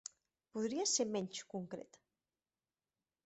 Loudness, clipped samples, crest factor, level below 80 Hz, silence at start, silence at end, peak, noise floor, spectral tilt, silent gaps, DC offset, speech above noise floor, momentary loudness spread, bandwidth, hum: -39 LUFS; under 0.1%; 20 dB; -84 dBFS; 0.55 s; 1.4 s; -22 dBFS; under -90 dBFS; -3 dB/octave; none; under 0.1%; over 50 dB; 16 LU; 8.2 kHz; none